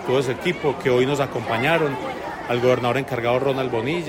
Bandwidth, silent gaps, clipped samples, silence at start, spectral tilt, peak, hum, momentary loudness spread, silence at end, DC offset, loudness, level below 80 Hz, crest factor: 16.5 kHz; none; under 0.1%; 0 s; -6 dB/octave; -6 dBFS; none; 6 LU; 0 s; under 0.1%; -22 LUFS; -52 dBFS; 16 dB